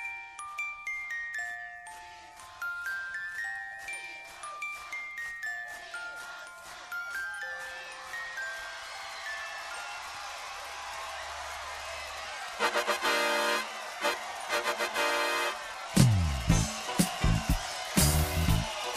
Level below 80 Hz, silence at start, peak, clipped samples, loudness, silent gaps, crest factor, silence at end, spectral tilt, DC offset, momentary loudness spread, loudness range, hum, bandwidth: -42 dBFS; 0 s; -8 dBFS; under 0.1%; -32 LUFS; none; 26 dB; 0 s; -4 dB/octave; under 0.1%; 13 LU; 10 LU; none; 15.5 kHz